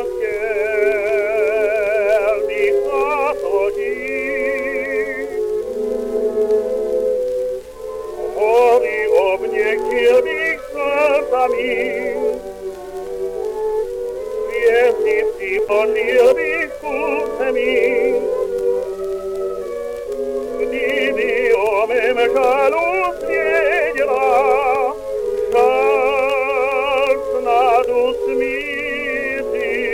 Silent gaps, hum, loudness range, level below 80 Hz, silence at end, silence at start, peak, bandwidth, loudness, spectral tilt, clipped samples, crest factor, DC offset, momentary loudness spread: none; none; 4 LU; -46 dBFS; 0 s; 0 s; -2 dBFS; 16 kHz; -18 LUFS; -3.5 dB/octave; under 0.1%; 14 dB; under 0.1%; 10 LU